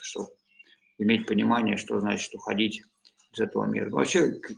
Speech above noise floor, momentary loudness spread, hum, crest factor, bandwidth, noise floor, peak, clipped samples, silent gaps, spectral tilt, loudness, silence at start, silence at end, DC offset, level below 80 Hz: 32 dB; 13 LU; none; 18 dB; 10 kHz; -59 dBFS; -10 dBFS; under 0.1%; none; -4.5 dB/octave; -27 LUFS; 0 s; 0 s; under 0.1%; -68 dBFS